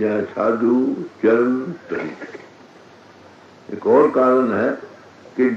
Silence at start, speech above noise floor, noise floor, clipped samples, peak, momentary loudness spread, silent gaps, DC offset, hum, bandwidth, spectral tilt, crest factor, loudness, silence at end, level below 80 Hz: 0 s; 27 dB; -45 dBFS; under 0.1%; -4 dBFS; 17 LU; none; under 0.1%; none; 7.4 kHz; -8 dB/octave; 16 dB; -18 LUFS; 0 s; -70 dBFS